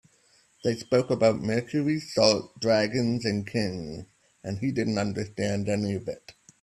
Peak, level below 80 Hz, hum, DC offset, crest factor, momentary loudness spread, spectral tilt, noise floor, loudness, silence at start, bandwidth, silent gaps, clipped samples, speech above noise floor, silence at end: -4 dBFS; -60 dBFS; none; under 0.1%; 24 dB; 14 LU; -5.5 dB/octave; -63 dBFS; -27 LUFS; 0.65 s; 13 kHz; none; under 0.1%; 37 dB; 0.3 s